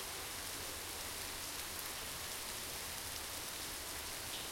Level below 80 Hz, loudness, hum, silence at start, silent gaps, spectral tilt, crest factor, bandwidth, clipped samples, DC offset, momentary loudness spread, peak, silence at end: -62 dBFS; -42 LUFS; none; 0 s; none; -1 dB/octave; 22 dB; 16.5 kHz; under 0.1%; under 0.1%; 1 LU; -22 dBFS; 0 s